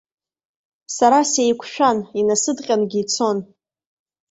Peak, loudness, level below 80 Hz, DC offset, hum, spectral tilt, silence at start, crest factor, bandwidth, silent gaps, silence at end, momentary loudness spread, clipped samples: -2 dBFS; -18 LUFS; -66 dBFS; under 0.1%; none; -3 dB/octave; 0.9 s; 18 dB; 8.2 kHz; none; 0.85 s; 6 LU; under 0.1%